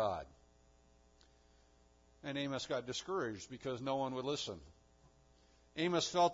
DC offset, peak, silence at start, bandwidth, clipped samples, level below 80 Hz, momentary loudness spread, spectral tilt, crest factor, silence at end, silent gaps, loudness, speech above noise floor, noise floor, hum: under 0.1%; -20 dBFS; 0 s; 7.4 kHz; under 0.1%; -68 dBFS; 13 LU; -3.5 dB/octave; 20 dB; 0 s; none; -40 LUFS; 30 dB; -68 dBFS; none